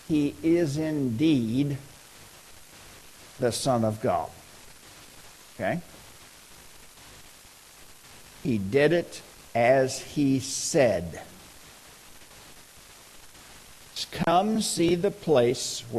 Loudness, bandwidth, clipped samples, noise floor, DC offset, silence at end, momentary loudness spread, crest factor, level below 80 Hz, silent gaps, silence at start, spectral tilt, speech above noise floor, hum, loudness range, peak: -26 LUFS; 13 kHz; under 0.1%; -51 dBFS; under 0.1%; 0 s; 25 LU; 20 dB; -56 dBFS; none; 0.1 s; -5 dB/octave; 26 dB; none; 14 LU; -8 dBFS